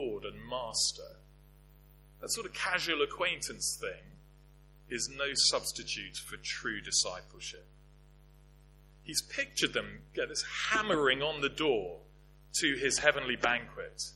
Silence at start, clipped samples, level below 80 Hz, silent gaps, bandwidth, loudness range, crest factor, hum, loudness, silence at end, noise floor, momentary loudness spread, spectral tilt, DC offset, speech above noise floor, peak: 0 s; under 0.1%; -58 dBFS; none; 16.5 kHz; 6 LU; 28 dB; 50 Hz at -55 dBFS; -32 LUFS; 0 s; -58 dBFS; 16 LU; -1.5 dB/octave; under 0.1%; 25 dB; -8 dBFS